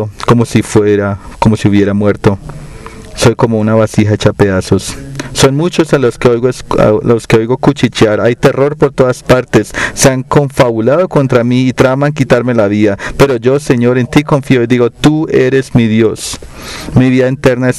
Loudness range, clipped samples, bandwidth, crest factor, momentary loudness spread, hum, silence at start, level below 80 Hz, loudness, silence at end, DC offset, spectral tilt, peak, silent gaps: 2 LU; 0.1%; 15.5 kHz; 10 dB; 5 LU; none; 0 s; -32 dBFS; -10 LUFS; 0 s; 0.3%; -6 dB/octave; 0 dBFS; none